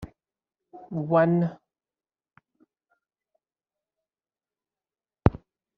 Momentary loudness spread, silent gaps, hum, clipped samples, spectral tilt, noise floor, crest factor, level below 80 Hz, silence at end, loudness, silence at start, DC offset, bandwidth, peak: 14 LU; none; none; under 0.1%; -9 dB/octave; under -90 dBFS; 30 dB; -48 dBFS; 0.4 s; -25 LUFS; 0 s; under 0.1%; 4.9 kHz; 0 dBFS